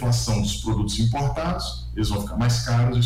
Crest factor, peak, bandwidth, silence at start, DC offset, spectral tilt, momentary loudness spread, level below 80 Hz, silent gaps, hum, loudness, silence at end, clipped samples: 10 dB; -12 dBFS; 15 kHz; 0 s; under 0.1%; -5.5 dB/octave; 6 LU; -32 dBFS; none; none; -24 LUFS; 0 s; under 0.1%